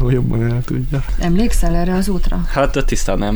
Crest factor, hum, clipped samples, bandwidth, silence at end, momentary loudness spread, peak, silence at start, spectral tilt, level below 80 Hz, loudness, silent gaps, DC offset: 12 dB; none; under 0.1%; over 20 kHz; 0 s; 4 LU; -2 dBFS; 0 s; -6.5 dB/octave; -18 dBFS; -18 LUFS; none; under 0.1%